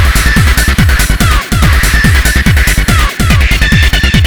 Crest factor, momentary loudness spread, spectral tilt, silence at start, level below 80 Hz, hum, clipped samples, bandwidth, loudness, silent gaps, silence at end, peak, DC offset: 8 dB; 2 LU; -4 dB/octave; 0 s; -10 dBFS; none; 1%; over 20 kHz; -8 LUFS; none; 0 s; 0 dBFS; 3%